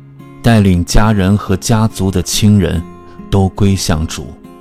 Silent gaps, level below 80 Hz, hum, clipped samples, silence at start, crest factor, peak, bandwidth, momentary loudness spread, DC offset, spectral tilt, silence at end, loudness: none; -24 dBFS; none; 1%; 0.2 s; 12 dB; 0 dBFS; 16 kHz; 11 LU; under 0.1%; -5.5 dB/octave; 0.1 s; -13 LUFS